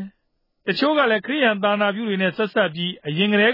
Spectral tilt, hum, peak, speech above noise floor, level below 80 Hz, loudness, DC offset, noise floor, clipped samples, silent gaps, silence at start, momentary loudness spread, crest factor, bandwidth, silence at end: -7.5 dB/octave; none; -6 dBFS; 50 dB; -70 dBFS; -20 LUFS; under 0.1%; -70 dBFS; under 0.1%; none; 0 s; 8 LU; 14 dB; 5.6 kHz; 0 s